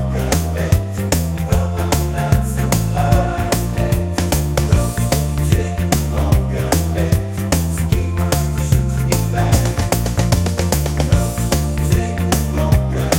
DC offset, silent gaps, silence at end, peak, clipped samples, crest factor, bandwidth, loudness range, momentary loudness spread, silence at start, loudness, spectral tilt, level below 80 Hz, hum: under 0.1%; none; 0 s; 0 dBFS; under 0.1%; 16 dB; 17 kHz; 1 LU; 2 LU; 0 s; -17 LUFS; -5.5 dB/octave; -24 dBFS; none